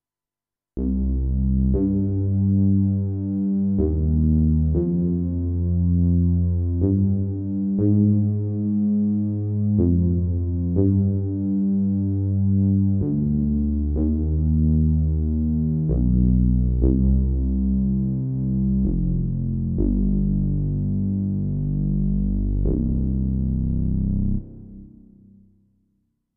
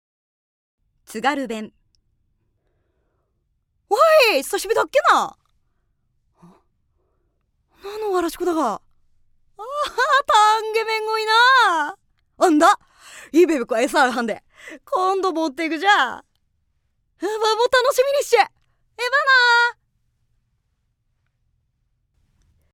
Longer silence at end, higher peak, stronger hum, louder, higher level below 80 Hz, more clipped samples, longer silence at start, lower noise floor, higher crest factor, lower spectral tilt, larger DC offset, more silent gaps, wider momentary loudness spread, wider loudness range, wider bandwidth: second, 1.45 s vs 3 s; about the same, -4 dBFS vs -2 dBFS; neither; second, -22 LUFS vs -18 LUFS; first, -26 dBFS vs -62 dBFS; neither; second, 0.75 s vs 1.1 s; first, under -90 dBFS vs -70 dBFS; about the same, 16 dB vs 20 dB; first, -17.5 dB/octave vs -2 dB/octave; neither; neither; second, 5 LU vs 15 LU; second, 3 LU vs 10 LU; second, 1.4 kHz vs 18 kHz